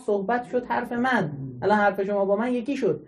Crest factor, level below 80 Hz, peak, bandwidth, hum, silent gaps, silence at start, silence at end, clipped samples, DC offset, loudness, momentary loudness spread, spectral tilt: 16 dB; -62 dBFS; -8 dBFS; 12.5 kHz; none; none; 0 s; 0 s; under 0.1%; under 0.1%; -25 LUFS; 6 LU; -7 dB/octave